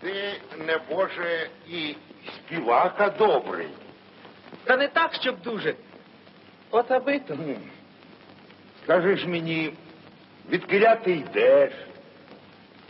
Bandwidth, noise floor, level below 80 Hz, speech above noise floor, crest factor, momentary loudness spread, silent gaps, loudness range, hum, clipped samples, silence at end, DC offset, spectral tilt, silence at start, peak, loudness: 5.8 kHz; -51 dBFS; -76 dBFS; 27 dB; 20 dB; 18 LU; none; 5 LU; none; under 0.1%; 0.55 s; under 0.1%; -9.5 dB/octave; 0 s; -6 dBFS; -24 LUFS